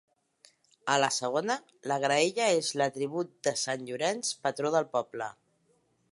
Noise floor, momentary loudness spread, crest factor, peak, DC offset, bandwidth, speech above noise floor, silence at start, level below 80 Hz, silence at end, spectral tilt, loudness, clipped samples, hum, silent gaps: -71 dBFS; 8 LU; 20 dB; -12 dBFS; under 0.1%; 11.5 kHz; 41 dB; 0.85 s; -82 dBFS; 0.8 s; -3 dB/octave; -30 LUFS; under 0.1%; none; none